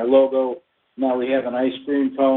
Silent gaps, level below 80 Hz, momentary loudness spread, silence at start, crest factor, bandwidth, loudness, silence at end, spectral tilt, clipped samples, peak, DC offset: none; -66 dBFS; 9 LU; 0 s; 16 dB; 4.1 kHz; -21 LUFS; 0 s; -3.5 dB/octave; under 0.1%; -4 dBFS; under 0.1%